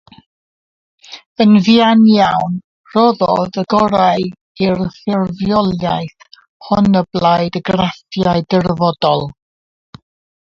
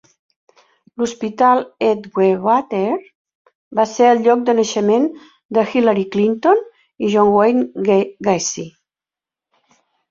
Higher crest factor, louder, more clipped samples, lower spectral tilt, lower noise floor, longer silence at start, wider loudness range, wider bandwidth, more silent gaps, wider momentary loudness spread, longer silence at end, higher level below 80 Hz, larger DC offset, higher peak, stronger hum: about the same, 14 dB vs 16 dB; about the same, -14 LUFS vs -16 LUFS; neither; first, -7.5 dB/octave vs -5 dB/octave; about the same, under -90 dBFS vs -89 dBFS; about the same, 1.1 s vs 1 s; about the same, 4 LU vs 3 LU; about the same, 7.2 kHz vs 7.6 kHz; first, 1.26-1.35 s, 2.64-2.84 s, 4.41-4.55 s, 6.49-6.60 s vs 3.15-3.25 s, 3.35-3.45 s, 3.55-3.71 s, 5.45-5.49 s; about the same, 12 LU vs 10 LU; second, 1.1 s vs 1.4 s; first, -46 dBFS vs -62 dBFS; neither; about the same, 0 dBFS vs -2 dBFS; neither